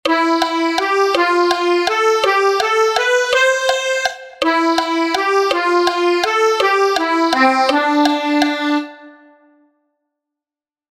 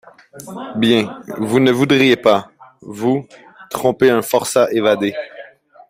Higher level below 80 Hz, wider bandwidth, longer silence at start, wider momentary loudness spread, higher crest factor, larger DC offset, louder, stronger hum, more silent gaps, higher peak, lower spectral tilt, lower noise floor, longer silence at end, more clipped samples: about the same, -58 dBFS vs -58 dBFS; about the same, 16 kHz vs 16 kHz; second, 0.05 s vs 0.35 s; second, 4 LU vs 17 LU; about the same, 16 dB vs 16 dB; neither; about the same, -15 LUFS vs -16 LUFS; neither; neither; about the same, 0 dBFS vs -2 dBFS; second, -1.5 dB/octave vs -5 dB/octave; first, under -90 dBFS vs -40 dBFS; first, 1.8 s vs 0.45 s; neither